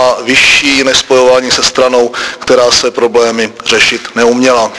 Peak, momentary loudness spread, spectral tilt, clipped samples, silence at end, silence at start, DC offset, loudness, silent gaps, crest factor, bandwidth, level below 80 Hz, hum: 0 dBFS; 6 LU; -1.5 dB/octave; 1%; 0 s; 0 s; under 0.1%; -8 LUFS; none; 8 dB; 11 kHz; -40 dBFS; none